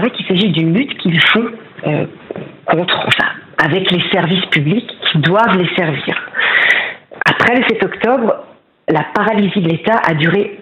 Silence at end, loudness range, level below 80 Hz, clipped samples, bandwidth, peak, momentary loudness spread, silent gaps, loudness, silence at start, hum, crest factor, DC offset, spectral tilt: 0 s; 2 LU; -54 dBFS; under 0.1%; 10.5 kHz; 0 dBFS; 8 LU; none; -13 LUFS; 0 s; none; 14 dB; under 0.1%; -6.5 dB/octave